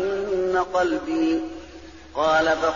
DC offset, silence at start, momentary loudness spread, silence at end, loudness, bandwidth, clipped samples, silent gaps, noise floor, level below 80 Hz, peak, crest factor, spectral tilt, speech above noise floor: 0.2%; 0 s; 19 LU; 0 s; -22 LUFS; 7.2 kHz; under 0.1%; none; -43 dBFS; -50 dBFS; -10 dBFS; 14 dB; -2.5 dB/octave; 21 dB